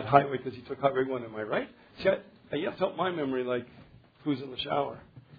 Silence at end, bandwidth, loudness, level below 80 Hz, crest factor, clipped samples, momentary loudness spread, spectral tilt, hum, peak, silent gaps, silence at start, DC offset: 0.2 s; 5 kHz; -31 LUFS; -64 dBFS; 26 dB; under 0.1%; 10 LU; -4 dB/octave; none; -6 dBFS; none; 0 s; under 0.1%